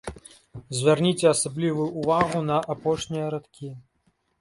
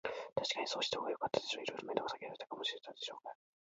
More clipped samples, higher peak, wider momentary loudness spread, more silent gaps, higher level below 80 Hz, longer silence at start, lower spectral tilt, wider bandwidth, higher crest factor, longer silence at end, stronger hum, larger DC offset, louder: neither; first, -6 dBFS vs -16 dBFS; first, 19 LU vs 9 LU; neither; first, -54 dBFS vs -78 dBFS; about the same, 0.05 s vs 0.05 s; first, -5 dB/octave vs -0.5 dB/octave; first, 11.5 kHz vs 7.6 kHz; about the same, 20 dB vs 24 dB; first, 0.6 s vs 0.45 s; neither; neither; first, -24 LUFS vs -40 LUFS